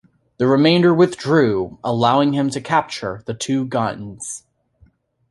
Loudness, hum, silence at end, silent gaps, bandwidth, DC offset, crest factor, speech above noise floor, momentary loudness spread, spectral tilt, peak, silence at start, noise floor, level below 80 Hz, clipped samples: -18 LUFS; none; 0.95 s; none; 11.5 kHz; under 0.1%; 16 dB; 38 dB; 15 LU; -5.5 dB/octave; -2 dBFS; 0.4 s; -55 dBFS; -54 dBFS; under 0.1%